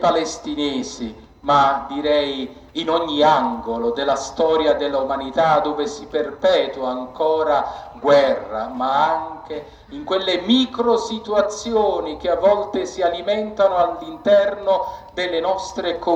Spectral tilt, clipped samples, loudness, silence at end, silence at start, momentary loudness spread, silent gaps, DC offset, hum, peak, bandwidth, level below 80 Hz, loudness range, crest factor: -4 dB/octave; under 0.1%; -20 LUFS; 0 s; 0 s; 10 LU; none; under 0.1%; none; -2 dBFS; 8.6 kHz; -50 dBFS; 1 LU; 18 dB